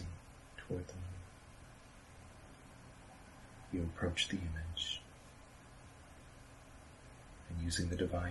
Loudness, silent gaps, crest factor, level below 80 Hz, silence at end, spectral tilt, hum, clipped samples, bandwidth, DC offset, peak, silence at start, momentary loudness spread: -41 LUFS; none; 22 dB; -54 dBFS; 0 s; -4.5 dB/octave; none; under 0.1%; 12 kHz; under 0.1%; -22 dBFS; 0 s; 20 LU